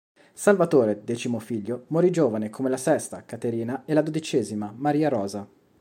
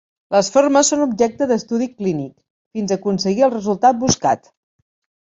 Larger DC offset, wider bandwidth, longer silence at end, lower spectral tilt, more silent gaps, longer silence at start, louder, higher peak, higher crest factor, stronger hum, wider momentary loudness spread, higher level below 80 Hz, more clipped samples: neither; first, 16.5 kHz vs 8.4 kHz; second, 0.35 s vs 1 s; first, -6 dB/octave vs -4.5 dB/octave; second, none vs 2.50-2.71 s; about the same, 0.35 s vs 0.3 s; second, -25 LUFS vs -17 LUFS; about the same, -4 dBFS vs -2 dBFS; about the same, 20 dB vs 16 dB; neither; about the same, 10 LU vs 10 LU; second, -72 dBFS vs -52 dBFS; neither